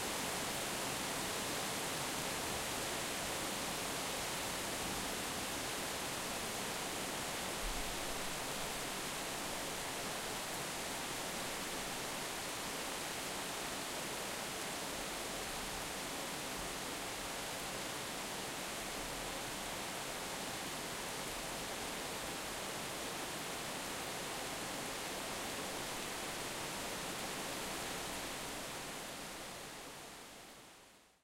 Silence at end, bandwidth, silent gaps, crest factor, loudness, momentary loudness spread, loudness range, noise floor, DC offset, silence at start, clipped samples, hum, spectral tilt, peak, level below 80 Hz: 0.15 s; 16 kHz; none; 16 dB; -40 LUFS; 3 LU; 3 LU; -63 dBFS; under 0.1%; 0 s; under 0.1%; none; -2 dB/octave; -26 dBFS; -60 dBFS